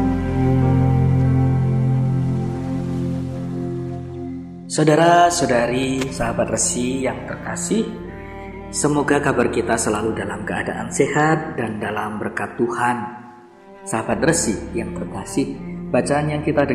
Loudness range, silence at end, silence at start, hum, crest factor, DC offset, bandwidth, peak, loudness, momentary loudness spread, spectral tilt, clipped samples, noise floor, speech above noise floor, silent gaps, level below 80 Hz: 5 LU; 0 s; 0 s; none; 18 dB; under 0.1%; 13.5 kHz; -2 dBFS; -20 LUFS; 12 LU; -5.5 dB/octave; under 0.1%; -43 dBFS; 24 dB; none; -40 dBFS